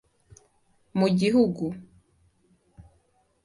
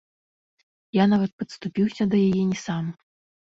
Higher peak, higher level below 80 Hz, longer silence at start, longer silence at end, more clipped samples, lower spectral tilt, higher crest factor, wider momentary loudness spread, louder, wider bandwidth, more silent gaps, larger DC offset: about the same, -10 dBFS vs -8 dBFS; about the same, -60 dBFS vs -60 dBFS; about the same, 0.95 s vs 0.95 s; first, 0.65 s vs 0.5 s; neither; about the same, -7 dB/octave vs -7 dB/octave; about the same, 20 dB vs 18 dB; first, 13 LU vs 10 LU; about the same, -24 LUFS vs -24 LUFS; first, 11.5 kHz vs 7.6 kHz; second, none vs 1.33-1.38 s; neither